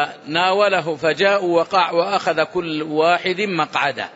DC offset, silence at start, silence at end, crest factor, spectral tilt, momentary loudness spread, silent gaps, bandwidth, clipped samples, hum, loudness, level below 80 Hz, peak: under 0.1%; 0 s; 0.05 s; 16 dB; -4.5 dB/octave; 5 LU; none; 8 kHz; under 0.1%; none; -18 LUFS; -64 dBFS; -4 dBFS